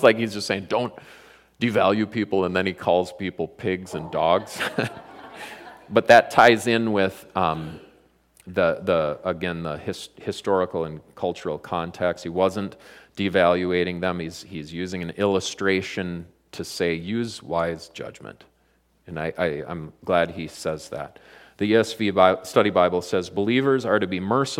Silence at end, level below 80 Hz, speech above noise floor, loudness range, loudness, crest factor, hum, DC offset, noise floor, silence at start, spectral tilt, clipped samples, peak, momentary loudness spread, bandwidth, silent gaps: 0 s; -58 dBFS; 41 dB; 9 LU; -23 LUFS; 22 dB; none; under 0.1%; -64 dBFS; 0 s; -5 dB/octave; under 0.1%; -2 dBFS; 16 LU; 16.5 kHz; none